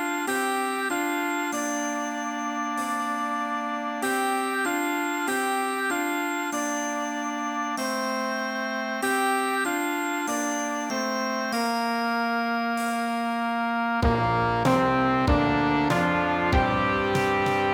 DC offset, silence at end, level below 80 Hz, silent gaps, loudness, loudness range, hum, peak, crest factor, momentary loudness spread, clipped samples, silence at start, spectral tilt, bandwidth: under 0.1%; 0 s; -42 dBFS; none; -25 LUFS; 5 LU; none; -8 dBFS; 16 dB; 6 LU; under 0.1%; 0 s; -4.5 dB/octave; 19 kHz